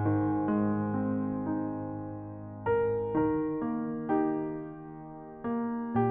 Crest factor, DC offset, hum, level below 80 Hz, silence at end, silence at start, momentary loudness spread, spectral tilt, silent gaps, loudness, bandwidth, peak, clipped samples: 14 dB; under 0.1%; none; -58 dBFS; 0 s; 0 s; 13 LU; -9.5 dB/octave; none; -31 LUFS; 3.4 kHz; -16 dBFS; under 0.1%